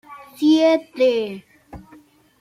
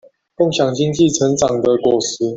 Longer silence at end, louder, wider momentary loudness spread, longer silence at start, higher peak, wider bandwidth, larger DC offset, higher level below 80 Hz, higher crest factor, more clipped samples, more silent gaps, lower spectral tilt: first, 0.65 s vs 0 s; about the same, -18 LUFS vs -16 LUFS; first, 14 LU vs 3 LU; second, 0.1 s vs 0.4 s; second, -6 dBFS vs -2 dBFS; first, 14.5 kHz vs 8 kHz; neither; second, -56 dBFS vs -50 dBFS; about the same, 14 dB vs 14 dB; neither; neither; about the same, -5 dB/octave vs -5 dB/octave